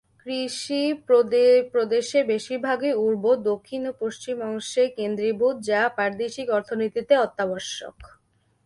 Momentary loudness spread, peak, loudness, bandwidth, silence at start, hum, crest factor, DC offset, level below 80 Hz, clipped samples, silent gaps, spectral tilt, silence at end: 11 LU; -6 dBFS; -23 LUFS; 11.5 kHz; 0.25 s; none; 18 dB; under 0.1%; -64 dBFS; under 0.1%; none; -4 dB/octave; 0.6 s